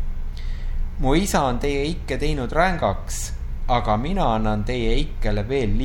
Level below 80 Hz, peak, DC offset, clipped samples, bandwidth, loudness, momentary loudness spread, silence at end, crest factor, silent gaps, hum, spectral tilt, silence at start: -24 dBFS; -4 dBFS; under 0.1%; under 0.1%; 16.5 kHz; -23 LUFS; 12 LU; 0 s; 16 dB; none; none; -5.5 dB/octave; 0 s